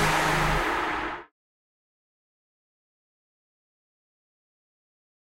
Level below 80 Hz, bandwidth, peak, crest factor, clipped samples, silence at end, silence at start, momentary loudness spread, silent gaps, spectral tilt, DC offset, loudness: -42 dBFS; 16 kHz; -12 dBFS; 20 dB; under 0.1%; 4.1 s; 0 s; 12 LU; none; -4 dB/octave; under 0.1%; -25 LUFS